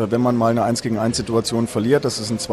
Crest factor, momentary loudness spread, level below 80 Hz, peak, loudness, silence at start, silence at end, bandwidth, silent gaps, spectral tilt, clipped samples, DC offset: 14 dB; 4 LU; -48 dBFS; -4 dBFS; -19 LUFS; 0 s; 0 s; 14.5 kHz; none; -5.5 dB/octave; under 0.1%; under 0.1%